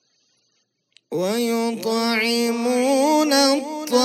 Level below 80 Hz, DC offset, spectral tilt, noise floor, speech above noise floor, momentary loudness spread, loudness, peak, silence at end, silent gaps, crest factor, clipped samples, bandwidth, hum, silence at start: -84 dBFS; under 0.1%; -3 dB/octave; -69 dBFS; 49 dB; 7 LU; -20 LUFS; -4 dBFS; 0 s; none; 18 dB; under 0.1%; 16 kHz; none; 1.1 s